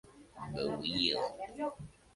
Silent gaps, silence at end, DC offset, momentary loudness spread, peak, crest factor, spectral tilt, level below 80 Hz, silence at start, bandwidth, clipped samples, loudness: none; 0.25 s; under 0.1%; 15 LU; -16 dBFS; 22 dB; -5 dB/octave; -62 dBFS; 0.05 s; 11.5 kHz; under 0.1%; -35 LUFS